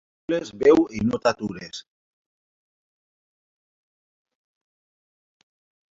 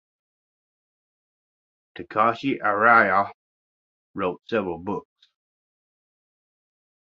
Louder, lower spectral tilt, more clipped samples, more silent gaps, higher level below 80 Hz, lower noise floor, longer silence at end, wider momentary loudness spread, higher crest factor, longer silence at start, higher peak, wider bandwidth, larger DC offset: about the same, -22 LUFS vs -22 LUFS; about the same, -6 dB/octave vs -7 dB/octave; neither; second, none vs 3.34-4.14 s; first, -58 dBFS vs -64 dBFS; about the same, under -90 dBFS vs under -90 dBFS; first, 4.15 s vs 2.1 s; about the same, 19 LU vs 17 LU; about the same, 22 dB vs 24 dB; second, 0.3 s vs 2 s; second, -6 dBFS vs -2 dBFS; about the same, 7.8 kHz vs 7.2 kHz; neither